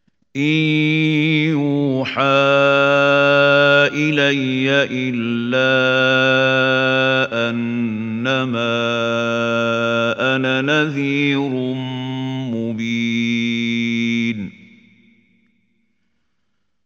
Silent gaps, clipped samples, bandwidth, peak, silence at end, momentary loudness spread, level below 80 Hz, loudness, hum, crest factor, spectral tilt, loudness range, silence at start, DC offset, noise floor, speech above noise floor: none; under 0.1%; 7.6 kHz; -2 dBFS; 2.35 s; 9 LU; -64 dBFS; -17 LUFS; none; 16 dB; -6 dB/octave; 7 LU; 0.35 s; under 0.1%; -74 dBFS; 57 dB